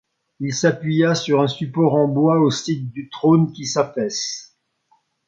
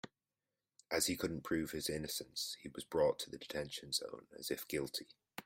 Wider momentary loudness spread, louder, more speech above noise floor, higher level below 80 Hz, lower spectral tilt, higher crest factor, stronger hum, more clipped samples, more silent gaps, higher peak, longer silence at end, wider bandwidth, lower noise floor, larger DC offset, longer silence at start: about the same, 10 LU vs 11 LU; first, -19 LUFS vs -40 LUFS; second, 45 dB vs over 50 dB; about the same, -64 dBFS vs -68 dBFS; first, -5.5 dB/octave vs -3 dB/octave; about the same, 18 dB vs 22 dB; neither; neither; neither; first, -2 dBFS vs -20 dBFS; first, 0.85 s vs 0.05 s; second, 7.8 kHz vs 16 kHz; second, -63 dBFS vs under -90 dBFS; neither; first, 0.4 s vs 0.05 s